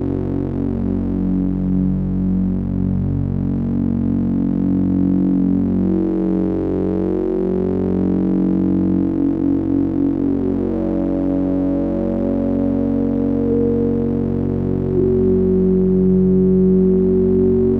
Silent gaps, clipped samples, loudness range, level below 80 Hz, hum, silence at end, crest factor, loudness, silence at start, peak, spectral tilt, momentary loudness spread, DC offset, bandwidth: none; under 0.1%; 3 LU; -32 dBFS; none; 0 s; 12 dB; -18 LUFS; 0 s; -6 dBFS; -12.5 dB/octave; 5 LU; under 0.1%; 3.3 kHz